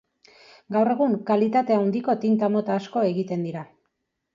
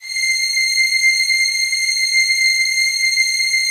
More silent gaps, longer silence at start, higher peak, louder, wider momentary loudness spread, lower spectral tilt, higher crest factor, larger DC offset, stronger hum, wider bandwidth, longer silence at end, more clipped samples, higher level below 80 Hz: neither; first, 0.7 s vs 0 s; second, -8 dBFS vs -4 dBFS; second, -23 LUFS vs -13 LUFS; first, 7 LU vs 3 LU; first, -8.5 dB/octave vs 8 dB/octave; about the same, 14 dB vs 12 dB; neither; neither; second, 7.4 kHz vs 15.5 kHz; first, 0.7 s vs 0 s; neither; second, -72 dBFS vs -64 dBFS